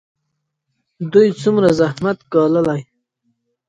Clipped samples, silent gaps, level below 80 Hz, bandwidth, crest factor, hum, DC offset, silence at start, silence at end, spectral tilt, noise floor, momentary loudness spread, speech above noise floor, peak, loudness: under 0.1%; none; -54 dBFS; 11 kHz; 18 dB; none; under 0.1%; 1 s; 0.85 s; -7 dB/octave; -74 dBFS; 8 LU; 59 dB; 0 dBFS; -16 LUFS